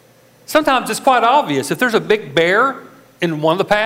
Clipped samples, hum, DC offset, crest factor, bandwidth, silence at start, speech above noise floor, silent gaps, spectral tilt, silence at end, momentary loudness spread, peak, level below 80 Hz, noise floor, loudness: under 0.1%; none; under 0.1%; 14 dB; 16 kHz; 0.5 s; 29 dB; none; -4 dB/octave; 0 s; 6 LU; -2 dBFS; -54 dBFS; -44 dBFS; -15 LUFS